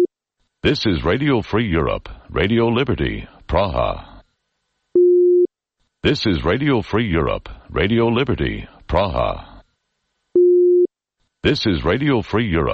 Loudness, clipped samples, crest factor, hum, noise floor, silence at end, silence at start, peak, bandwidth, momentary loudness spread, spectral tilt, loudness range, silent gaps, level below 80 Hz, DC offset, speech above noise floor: -18 LUFS; under 0.1%; 16 dB; none; -72 dBFS; 0 s; 0 s; -4 dBFS; 6.6 kHz; 10 LU; -7.5 dB/octave; 3 LU; none; -34 dBFS; under 0.1%; 54 dB